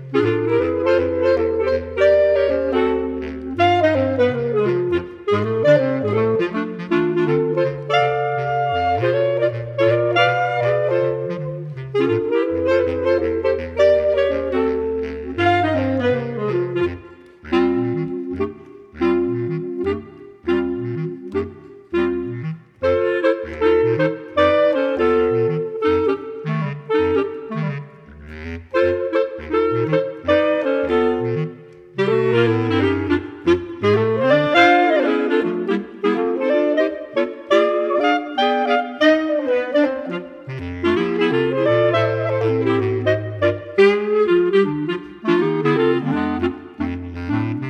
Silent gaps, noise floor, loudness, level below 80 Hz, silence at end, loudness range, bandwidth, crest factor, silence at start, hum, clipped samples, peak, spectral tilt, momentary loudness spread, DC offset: none; -41 dBFS; -19 LUFS; -46 dBFS; 0 s; 5 LU; 8 kHz; 18 dB; 0 s; none; under 0.1%; 0 dBFS; -7.5 dB/octave; 10 LU; under 0.1%